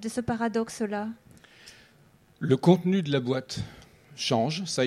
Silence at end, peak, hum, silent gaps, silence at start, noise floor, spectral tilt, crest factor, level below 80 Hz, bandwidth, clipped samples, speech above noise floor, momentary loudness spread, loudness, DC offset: 0 s; -6 dBFS; none; none; 0 s; -59 dBFS; -5.5 dB/octave; 22 dB; -60 dBFS; 13.5 kHz; under 0.1%; 33 dB; 15 LU; -27 LUFS; under 0.1%